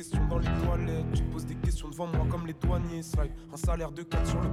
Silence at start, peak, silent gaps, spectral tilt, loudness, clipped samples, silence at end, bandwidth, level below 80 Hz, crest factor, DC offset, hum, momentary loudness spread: 0 s; -16 dBFS; none; -7 dB/octave; -32 LUFS; under 0.1%; 0 s; 14.5 kHz; -32 dBFS; 14 dB; under 0.1%; none; 5 LU